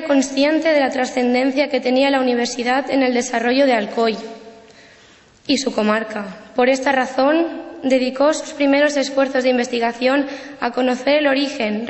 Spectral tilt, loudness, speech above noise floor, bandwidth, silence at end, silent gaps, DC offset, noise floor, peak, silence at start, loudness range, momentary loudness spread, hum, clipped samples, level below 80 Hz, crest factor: -3.5 dB/octave; -18 LUFS; 31 dB; 8.4 kHz; 0 s; none; under 0.1%; -49 dBFS; -4 dBFS; 0 s; 3 LU; 7 LU; none; under 0.1%; -60 dBFS; 14 dB